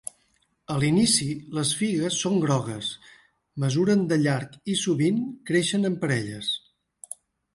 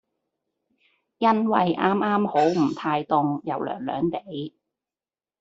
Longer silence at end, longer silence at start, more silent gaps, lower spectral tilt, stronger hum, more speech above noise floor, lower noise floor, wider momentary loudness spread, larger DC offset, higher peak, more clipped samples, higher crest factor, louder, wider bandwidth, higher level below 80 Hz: about the same, 0.95 s vs 0.9 s; second, 0.7 s vs 1.2 s; neither; second, -4.5 dB/octave vs -7 dB/octave; neither; second, 44 dB vs over 67 dB; second, -68 dBFS vs under -90 dBFS; first, 16 LU vs 10 LU; neither; second, -8 dBFS vs -4 dBFS; neither; about the same, 18 dB vs 20 dB; about the same, -25 LUFS vs -23 LUFS; first, 11.5 kHz vs 7.8 kHz; first, -60 dBFS vs -66 dBFS